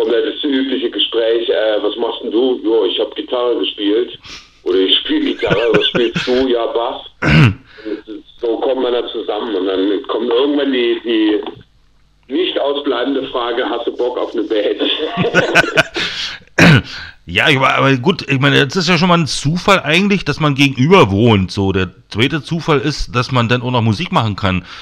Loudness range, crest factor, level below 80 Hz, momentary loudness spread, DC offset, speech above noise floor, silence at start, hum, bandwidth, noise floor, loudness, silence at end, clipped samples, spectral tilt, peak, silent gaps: 5 LU; 14 dB; -40 dBFS; 9 LU; under 0.1%; 37 dB; 0 s; none; 15 kHz; -51 dBFS; -14 LUFS; 0 s; under 0.1%; -5.5 dB/octave; 0 dBFS; none